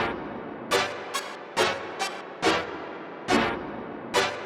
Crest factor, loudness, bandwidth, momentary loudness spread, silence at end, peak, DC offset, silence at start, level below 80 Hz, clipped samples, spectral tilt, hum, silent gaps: 20 dB; -28 LUFS; 17 kHz; 12 LU; 0 s; -8 dBFS; under 0.1%; 0 s; -56 dBFS; under 0.1%; -3 dB/octave; none; none